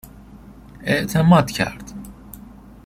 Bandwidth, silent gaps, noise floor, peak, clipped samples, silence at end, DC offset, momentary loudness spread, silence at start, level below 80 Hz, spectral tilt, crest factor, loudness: 16 kHz; none; -42 dBFS; -2 dBFS; under 0.1%; 0.45 s; under 0.1%; 26 LU; 0.8 s; -44 dBFS; -6 dB/octave; 20 dB; -18 LUFS